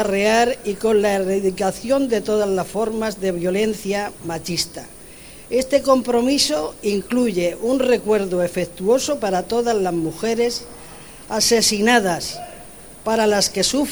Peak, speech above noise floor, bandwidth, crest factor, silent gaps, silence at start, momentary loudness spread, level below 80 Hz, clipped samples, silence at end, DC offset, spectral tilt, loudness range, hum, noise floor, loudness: -2 dBFS; 21 dB; over 20 kHz; 18 dB; none; 0 s; 13 LU; -48 dBFS; under 0.1%; 0 s; 0.4%; -3.5 dB/octave; 3 LU; none; -40 dBFS; -19 LUFS